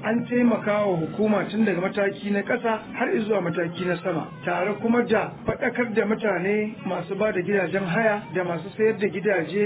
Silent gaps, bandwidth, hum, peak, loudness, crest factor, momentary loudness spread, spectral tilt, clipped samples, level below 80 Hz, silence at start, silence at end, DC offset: none; 4 kHz; none; -8 dBFS; -24 LUFS; 16 dB; 6 LU; -10.5 dB/octave; under 0.1%; -58 dBFS; 0 s; 0 s; under 0.1%